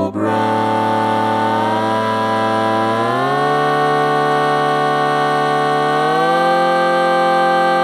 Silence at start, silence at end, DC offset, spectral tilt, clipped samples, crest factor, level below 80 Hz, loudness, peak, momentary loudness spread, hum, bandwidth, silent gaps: 0 s; 0 s; under 0.1%; -5.5 dB/octave; under 0.1%; 12 dB; -62 dBFS; -15 LUFS; -4 dBFS; 3 LU; none; 15.5 kHz; none